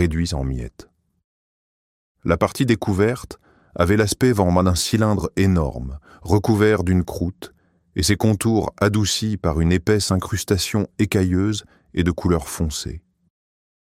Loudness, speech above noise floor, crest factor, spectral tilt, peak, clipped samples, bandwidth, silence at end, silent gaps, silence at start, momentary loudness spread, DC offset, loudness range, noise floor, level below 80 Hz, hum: -20 LUFS; over 71 dB; 18 dB; -5.5 dB/octave; -2 dBFS; under 0.1%; 16 kHz; 1 s; 1.24-2.15 s; 0 s; 13 LU; under 0.1%; 4 LU; under -90 dBFS; -36 dBFS; none